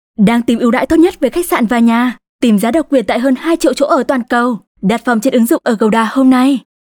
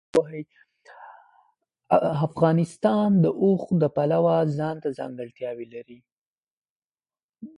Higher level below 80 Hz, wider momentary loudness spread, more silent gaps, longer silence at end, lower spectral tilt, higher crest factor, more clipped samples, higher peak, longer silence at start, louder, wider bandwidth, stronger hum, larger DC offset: first, -44 dBFS vs -64 dBFS; second, 5 LU vs 16 LU; second, 2.29-2.39 s, 4.67-4.75 s vs 6.12-6.43 s, 6.51-6.62 s, 6.70-6.90 s, 7.23-7.33 s; first, 0.25 s vs 0.1 s; second, -5.5 dB/octave vs -8.5 dB/octave; second, 10 dB vs 20 dB; neither; about the same, -2 dBFS vs -4 dBFS; about the same, 0.2 s vs 0.15 s; first, -12 LUFS vs -23 LUFS; first, 19 kHz vs 11 kHz; neither; neither